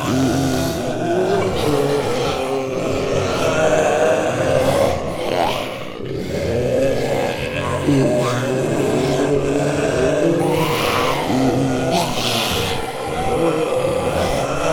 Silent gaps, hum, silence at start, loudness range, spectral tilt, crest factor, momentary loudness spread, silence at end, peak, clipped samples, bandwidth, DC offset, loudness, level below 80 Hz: none; none; 0 s; 2 LU; -5 dB/octave; 14 dB; 5 LU; 0 s; -4 dBFS; under 0.1%; over 20 kHz; under 0.1%; -19 LUFS; -40 dBFS